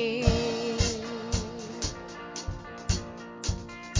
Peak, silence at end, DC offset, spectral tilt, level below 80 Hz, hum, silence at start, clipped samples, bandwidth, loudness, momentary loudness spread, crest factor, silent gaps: -8 dBFS; 0 s; under 0.1%; -4.5 dB/octave; -36 dBFS; none; 0 s; under 0.1%; 7.8 kHz; -31 LUFS; 12 LU; 24 dB; none